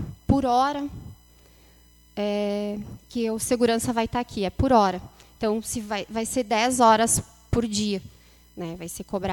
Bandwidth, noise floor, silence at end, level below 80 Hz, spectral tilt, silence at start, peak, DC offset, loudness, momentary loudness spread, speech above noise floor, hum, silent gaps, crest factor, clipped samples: 18 kHz; -55 dBFS; 0 s; -44 dBFS; -4.5 dB/octave; 0 s; -6 dBFS; under 0.1%; -24 LUFS; 15 LU; 31 dB; none; none; 20 dB; under 0.1%